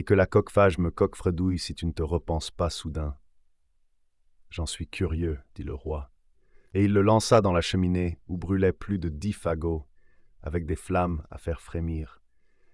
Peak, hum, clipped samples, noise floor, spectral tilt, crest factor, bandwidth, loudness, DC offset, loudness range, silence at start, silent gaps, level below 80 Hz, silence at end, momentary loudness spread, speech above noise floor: -8 dBFS; none; under 0.1%; -65 dBFS; -6.5 dB/octave; 20 dB; 12 kHz; -27 LUFS; under 0.1%; 10 LU; 0 s; none; -42 dBFS; 0.65 s; 14 LU; 39 dB